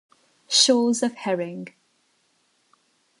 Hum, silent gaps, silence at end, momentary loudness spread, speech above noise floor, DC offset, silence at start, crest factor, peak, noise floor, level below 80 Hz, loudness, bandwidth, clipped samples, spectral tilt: none; none; 1.5 s; 20 LU; 45 dB; under 0.1%; 0.5 s; 22 dB; -4 dBFS; -67 dBFS; -80 dBFS; -21 LUFS; 11.5 kHz; under 0.1%; -2.5 dB/octave